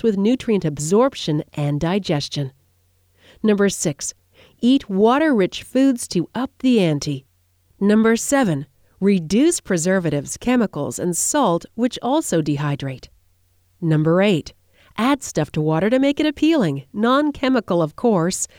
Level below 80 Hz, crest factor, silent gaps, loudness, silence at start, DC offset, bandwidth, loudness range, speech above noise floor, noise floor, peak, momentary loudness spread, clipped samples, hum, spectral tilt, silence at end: -50 dBFS; 16 dB; none; -19 LUFS; 0.05 s; under 0.1%; 17 kHz; 3 LU; 42 dB; -61 dBFS; -4 dBFS; 8 LU; under 0.1%; none; -5 dB/octave; 0.15 s